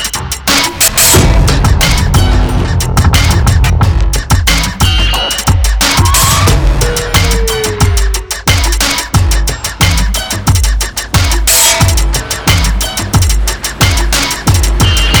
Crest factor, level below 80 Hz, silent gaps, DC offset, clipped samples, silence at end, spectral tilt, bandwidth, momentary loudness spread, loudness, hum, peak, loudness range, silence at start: 10 dB; -14 dBFS; none; under 0.1%; under 0.1%; 0 s; -3 dB/octave; over 20 kHz; 6 LU; -10 LUFS; none; 0 dBFS; 3 LU; 0 s